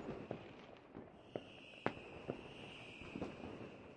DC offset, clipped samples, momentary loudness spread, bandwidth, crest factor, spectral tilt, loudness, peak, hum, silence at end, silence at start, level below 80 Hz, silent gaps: under 0.1%; under 0.1%; 11 LU; 10 kHz; 34 dB; -6.5 dB/octave; -51 LUFS; -16 dBFS; none; 0 s; 0 s; -70 dBFS; none